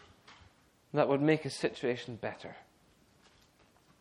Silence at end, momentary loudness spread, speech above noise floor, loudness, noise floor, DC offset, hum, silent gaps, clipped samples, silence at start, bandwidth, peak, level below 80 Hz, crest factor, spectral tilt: 1.4 s; 20 LU; 34 dB; -33 LUFS; -66 dBFS; under 0.1%; none; none; under 0.1%; 0.3 s; 12 kHz; -14 dBFS; -72 dBFS; 22 dB; -6 dB/octave